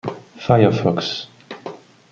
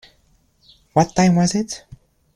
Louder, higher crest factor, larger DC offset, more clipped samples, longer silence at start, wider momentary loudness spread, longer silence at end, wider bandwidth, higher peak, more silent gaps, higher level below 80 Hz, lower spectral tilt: about the same, -18 LUFS vs -18 LUFS; about the same, 18 dB vs 20 dB; neither; neither; second, 0.05 s vs 0.95 s; first, 20 LU vs 13 LU; second, 0.35 s vs 0.6 s; second, 7.2 kHz vs 11 kHz; about the same, -2 dBFS vs -2 dBFS; neither; about the same, -52 dBFS vs -48 dBFS; first, -7 dB/octave vs -5.5 dB/octave